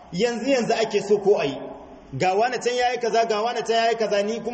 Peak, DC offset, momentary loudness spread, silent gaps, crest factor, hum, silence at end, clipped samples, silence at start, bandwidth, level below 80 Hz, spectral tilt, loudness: -8 dBFS; under 0.1%; 7 LU; none; 14 dB; none; 0 s; under 0.1%; 0 s; 8.4 kHz; -58 dBFS; -4 dB/octave; -22 LUFS